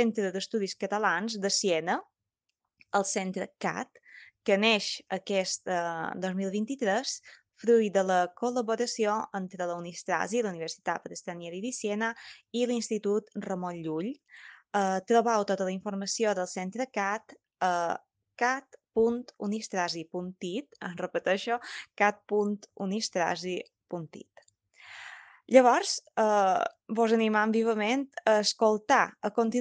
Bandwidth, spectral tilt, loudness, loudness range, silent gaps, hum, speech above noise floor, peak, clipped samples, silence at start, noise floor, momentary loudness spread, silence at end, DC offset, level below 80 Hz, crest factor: 10 kHz; -4 dB/octave; -29 LUFS; 6 LU; none; none; 56 dB; -6 dBFS; under 0.1%; 0 s; -85 dBFS; 12 LU; 0 s; under 0.1%; -78 dBFS; 24 dB